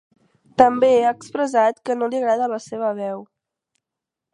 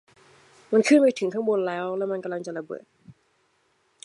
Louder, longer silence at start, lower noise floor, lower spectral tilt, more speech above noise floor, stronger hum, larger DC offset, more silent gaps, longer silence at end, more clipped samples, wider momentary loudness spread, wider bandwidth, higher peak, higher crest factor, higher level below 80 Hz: first, -20 LUFS vs -24 LUFS; about the same, 0.6 s vs 0.7 s; first, -85 dBFS vs -68 dBFS; about the same, -5 dB/octave vs -5 dB/octave; first, 67 dB vs 45 dB; neither; neither; neither; first, 1.1 s vs 0.95 s; neither; second, 13 LU vs 16 LU; about the same, 10.5 kHz vs 11.5 kHz; first, 0 dBFS vs -6 dBFS; about the same, 20 dB vs 20 dB; first, -64 dBFS vs -80 dBFS